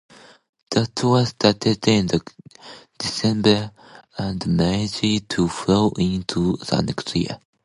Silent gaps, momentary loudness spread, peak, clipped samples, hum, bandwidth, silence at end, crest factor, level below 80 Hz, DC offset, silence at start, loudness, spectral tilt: none; 11 LU; 0 dBFS; under 0.1%; none; 11.5 kHz; 0.3 s; 20 dB; -46 dBFS; under 0.1%; 0.7 s; -21 LUFS; -5.5 dB/octave